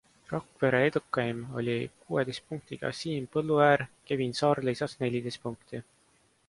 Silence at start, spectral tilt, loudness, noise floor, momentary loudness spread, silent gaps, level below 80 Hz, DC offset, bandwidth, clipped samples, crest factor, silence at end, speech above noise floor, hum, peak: 0.3 s; -6 dB/octave; -30 LUFS; -67 dBFS; 14 LU; none; -66 dBFS; under 0.1%; 11.5 kHz; under 0.1%; 20 dB; 0.65 s; 37 dB; none; -10 dBFS